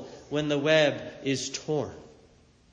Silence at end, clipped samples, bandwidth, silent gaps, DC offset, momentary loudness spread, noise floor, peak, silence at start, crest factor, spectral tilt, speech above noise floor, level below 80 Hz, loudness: 0.65 s; under 0.1%; 9.8 kHz; none; under 0.1%; 11 LU; -59 dBFS; -10 dBFS; 0 s; 20 dB; -4 dB/octave; 32 dB; -62 dBFS; -27 LUFS